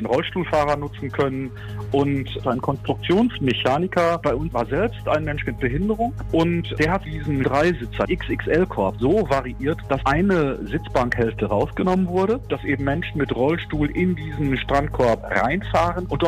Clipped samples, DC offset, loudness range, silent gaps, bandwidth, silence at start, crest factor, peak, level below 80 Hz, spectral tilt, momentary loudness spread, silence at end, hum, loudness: under 0.1%; under 0.1%; 1 LU; none; 15 kHz; 0 s; 16 dB; -6 dBFS; -36 dBFS; -7 dB/octave; 5 LU; 0 s; none; -22 LUFS